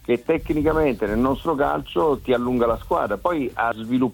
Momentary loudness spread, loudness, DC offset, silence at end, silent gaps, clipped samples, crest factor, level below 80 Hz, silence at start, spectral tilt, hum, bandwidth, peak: 3 LU; -22 LUFS; under 0.1%; 0 s; none; under 0.1%; 16 dB; -40 dBFS; 0.1 s; -7.5 dB/octave; none; 19 kHz; -6 dBFS